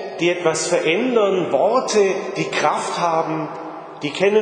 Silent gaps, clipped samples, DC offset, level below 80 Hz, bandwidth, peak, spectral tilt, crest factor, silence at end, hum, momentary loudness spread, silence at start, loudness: none; under 0.1%; under 0.1%; -72 dBFS; 10 kHz; -2 dBFS; -4 dB/octave; 18 dB; 0 s; none; 10 LU; 0 s; -19 LUFS